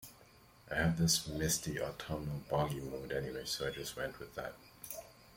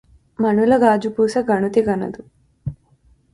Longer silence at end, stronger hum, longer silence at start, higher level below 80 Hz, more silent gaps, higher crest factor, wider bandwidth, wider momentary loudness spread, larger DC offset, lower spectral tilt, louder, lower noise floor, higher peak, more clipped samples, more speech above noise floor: second, 0 s vs 0.6 s; neither; second, 0 s vs 0.4 s; second, -56 dBFS vs -50 dBFS; neither; about the same, 20 dB vs 18 dB; first, 16.5 kHz vs 11.5 kHz; second, 15 LU vs 18 LU; neither; second, -4 dB/octave vs -7 dB/octave; second, -37 LUFS vs -17 LUFS; first, -62 dBFS vs -56 dBFS; second, -18 dBFS vs -2 dBFS; neither; second, 25 dB vs 39 dB